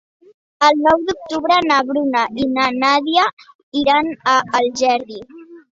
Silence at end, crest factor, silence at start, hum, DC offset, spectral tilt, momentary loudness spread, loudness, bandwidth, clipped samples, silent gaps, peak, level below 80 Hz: 0.2 s; 16 dB; 0.6 s; none; under 0.1%; -3 dB/octave; 8 LU; -16 LUFS; 7.8 kHz; under 0.1%; 3.33-3.37 s, 3.55-3.72 s; -2 dBFS; -54 dBFS